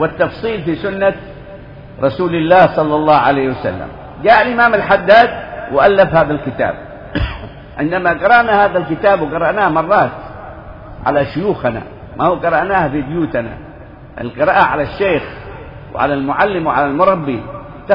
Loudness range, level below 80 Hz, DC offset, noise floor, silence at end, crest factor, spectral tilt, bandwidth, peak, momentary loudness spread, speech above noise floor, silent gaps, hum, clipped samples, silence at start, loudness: 5 LU; -38 dBFS; under 0.1%; -35 dBFS; 0 s; 14 dB; -8.5 dB/octave; 6 kHz; 0 dBFS; 20 LU; 21 dB; none; none; under 0.1%; 0 s; -14 LUFS